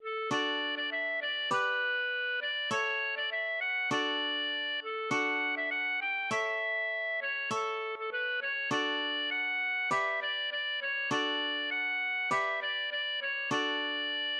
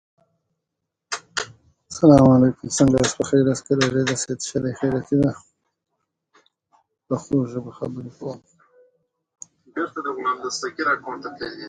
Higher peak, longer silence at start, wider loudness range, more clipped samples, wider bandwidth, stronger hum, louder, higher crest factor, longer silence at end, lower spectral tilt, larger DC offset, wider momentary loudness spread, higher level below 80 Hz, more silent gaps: second, -18 dBFS vs 0 dBFS; second, 0 s vs 1.1 s; second, 1 LU vs 12 LU; neither; first, 12 kHz vs 9.6 kHz; neither; second, -31 LUFS vs -21 LUFS; second, 14 dB vs 22 dB; about the same, 0 s vs 0 s; second, -2.5 dB/octave vs -5.5 dB/octave; neither; second, 3 LU vs 18 LU; second, -86 dBFS vs -50 dBFS; neither